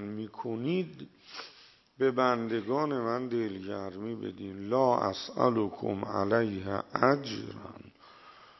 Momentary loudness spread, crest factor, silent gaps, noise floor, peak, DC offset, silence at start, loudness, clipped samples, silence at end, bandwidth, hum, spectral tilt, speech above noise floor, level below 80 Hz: 17 LU; 24 dB; none; -55 dBFS; -6 dBFS; under 0.1%; 0 s; -31 LUFS; under 0.1%; 0.15 s; 6.2 kHz; none; -7 dB/octave; 24 dB; -72 dBFS